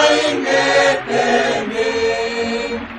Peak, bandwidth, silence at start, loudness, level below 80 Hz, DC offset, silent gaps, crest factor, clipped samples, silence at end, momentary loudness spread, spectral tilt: -2 dBFS; 10.5 kHz; 0 s; -16 LUFS; -48 dBFS; under 0.1%; none; 14 dB; under 0.1%; 0 s; 7 LU; -3 dB/octave